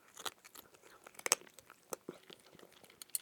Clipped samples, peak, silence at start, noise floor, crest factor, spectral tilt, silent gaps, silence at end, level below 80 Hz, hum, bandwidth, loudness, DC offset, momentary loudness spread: under 0.1%; -6 dBFS; 0.2 s; -61 dBFS; 40 dB; 0.5 dB/octave; none; 0 s; -88 dBFS; none; 19.5 kHz; -40 LUFS; under 0.1%; 25 LU